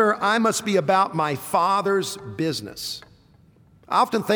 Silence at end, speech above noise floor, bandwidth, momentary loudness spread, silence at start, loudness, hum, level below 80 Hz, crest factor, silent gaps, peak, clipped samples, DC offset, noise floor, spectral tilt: 0 s; 33 dB; over 20 kHz; 11 LU; 0 s; -22 LUFS; none; -62 dBFS; 16 dB; none; -6 dBFS; under 0.1%; under 0.1%; -55 dBFS; -4 dB/octave